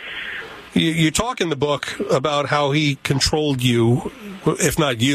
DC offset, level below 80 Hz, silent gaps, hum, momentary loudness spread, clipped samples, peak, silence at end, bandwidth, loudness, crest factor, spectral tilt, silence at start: under 0.1%; -42 dBFS; none; none; 8 LU; under 0.1%; -2 dBFS; 0 s; 15 kHz; -19 LUFS; 16 dB; -4.5 dB/octave; 0 s